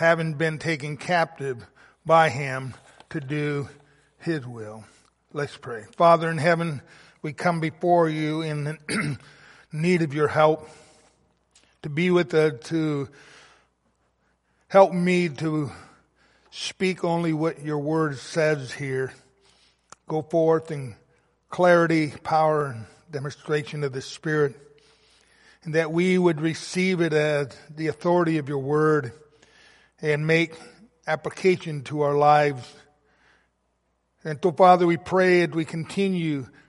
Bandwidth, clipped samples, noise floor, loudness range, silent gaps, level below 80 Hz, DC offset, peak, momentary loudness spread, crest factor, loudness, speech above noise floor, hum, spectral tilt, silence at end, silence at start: 11.5 kHz; under 0.1%; -72 dBFS; 4 LU; none; -66 dBFS; under 0.1%; -4 dBFS; 16 LU; 22 dB; -23 LUFS; 49 dB; none; -6.5 dB/octave; 0.2 s; 0 s